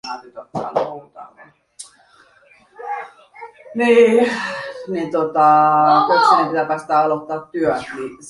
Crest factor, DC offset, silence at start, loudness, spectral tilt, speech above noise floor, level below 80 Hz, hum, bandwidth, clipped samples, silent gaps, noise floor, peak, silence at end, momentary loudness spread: 16 dB; under 0.1%; 0.05 s; -16 LUFS; -5 dB/octave; 36 dB; -62 dBFS; none; 11.5 kHz; under 0.1%; none; -52 dBFS; -2 dBFS; 0 s; 22 LU